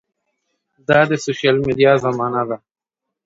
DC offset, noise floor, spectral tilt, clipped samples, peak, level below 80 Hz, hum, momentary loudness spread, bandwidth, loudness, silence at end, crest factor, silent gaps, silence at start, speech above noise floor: under 0.1%; -73 dBFS; -5.5 dB/octave; under 0.1%; 0 dBFS; -54 dBFS; none; 11 LU; 7.8 kHz; -17 LUFS; 0.7 s; 18 dB; none; 0.9 s; 57 dB